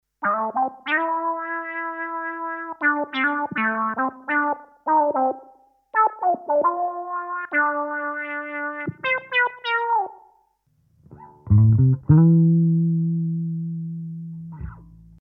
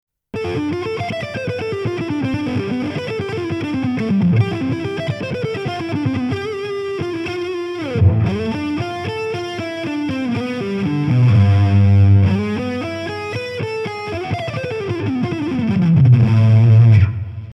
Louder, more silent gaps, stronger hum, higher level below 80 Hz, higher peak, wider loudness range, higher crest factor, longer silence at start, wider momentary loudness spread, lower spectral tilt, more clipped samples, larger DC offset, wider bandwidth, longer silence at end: second, -22 LUFS vs -18 LUFS; neither; neither; about the same, -48 dBFS vs -44 dBFS; about the same, -4 dBFS vs -2 dBFS; about the same, 5 LU vs 7 LU; about the same, 18 dB vs 14 dB; second, 0.2 s vs 0.35 s; about the same, 13 LU vs 12 LU; first, -10.5 dB/octave vs -8.5 dB/octave; neither; neither; second, 5 kHz vs 7.6 kHz; first, 0.35 s vs 0 s